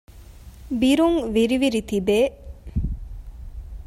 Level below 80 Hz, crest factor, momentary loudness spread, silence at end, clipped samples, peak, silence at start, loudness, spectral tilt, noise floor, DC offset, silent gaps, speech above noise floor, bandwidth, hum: -36 dBFS; 14 dB; 22 LU; 0 s; under 0.1%; -8 dBFS; 0.1 s; -22 LUFS; -6 dB/octave; -43 dBFS; under 0.1%; none; 23 dB; 16 kHz; none